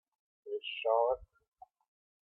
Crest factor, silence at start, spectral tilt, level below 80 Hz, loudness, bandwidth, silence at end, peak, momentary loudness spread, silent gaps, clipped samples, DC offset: 20 dB; 0.45 s; -5 dB/octave; -68 dBFS; -34 LUFS; 4.3 kHz; 1 s; -18 dBFS; 11 LU; none; under 0.1%; under 0.1%